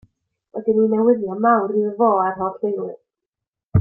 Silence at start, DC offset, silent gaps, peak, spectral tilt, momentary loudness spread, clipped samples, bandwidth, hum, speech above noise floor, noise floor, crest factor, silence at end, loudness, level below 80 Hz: 0.55 s; under 0.1%; 3.26-3.32 s, 3.48-3.53 s; -4 dBFS; -13 dB/octave; 10 LU; under 0.1%; 3 kHz; none; 67 dB; -85 dBFS; 16 dB; 0 s; -19 LUFS; -48 dBFS